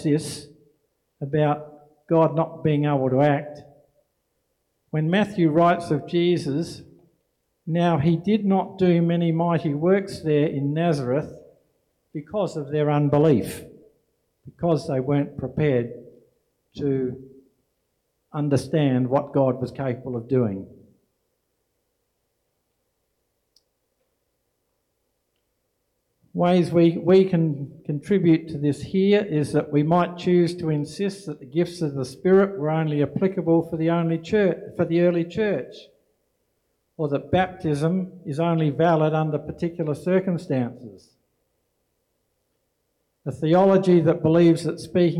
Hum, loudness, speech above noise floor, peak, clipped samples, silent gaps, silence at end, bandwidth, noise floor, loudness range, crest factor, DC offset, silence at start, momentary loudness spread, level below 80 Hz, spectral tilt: none; -22 LUFS; 53 dB; -8 dBFS; under 0.1%; none; 0 s; 13 kHz; -74 dBFS; 6 LU; 16 dB; under 0.1%; 0 s; 12 LU; -60 dBFS; -8 dB/octave